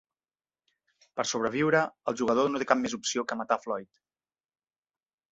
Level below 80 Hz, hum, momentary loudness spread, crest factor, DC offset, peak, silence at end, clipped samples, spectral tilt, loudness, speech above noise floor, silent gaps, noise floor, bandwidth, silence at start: -70 dBFS; none; 8 LU; 24 dB; under 0.1%; -6 dBFS; 1.5 s; under 0.1%; -3.5 dB/octave; -28 LUFS; over 62 dB; none; under -90 dBFS; 8.2 kHz; 1.15 s